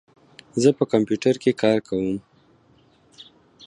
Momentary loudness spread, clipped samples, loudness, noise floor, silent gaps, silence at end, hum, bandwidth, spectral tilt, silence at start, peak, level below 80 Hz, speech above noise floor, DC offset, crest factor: 9 LU; under 0.1%; -22 LUFS; -57 dBFS; none; 1.5 s; none; 10.5 kHz; -6 dB/octave; 0.55 s; -4 dBFS; -60 dBFS; 37 dB; under 0.1%; 20 dB